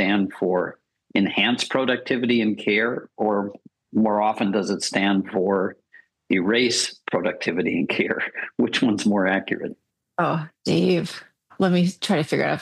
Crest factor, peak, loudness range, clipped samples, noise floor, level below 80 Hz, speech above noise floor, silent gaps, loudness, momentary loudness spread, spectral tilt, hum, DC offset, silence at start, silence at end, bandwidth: 18 dB; -4 dBFS; 1 LU; under 0.1%; -55 dBFS; -68 dBFS; 33 dB; none; -22 LUFS; 7 LU; -5 dB/octave; none; under 0.1%; 0 s; 0 s; 12.5 kHz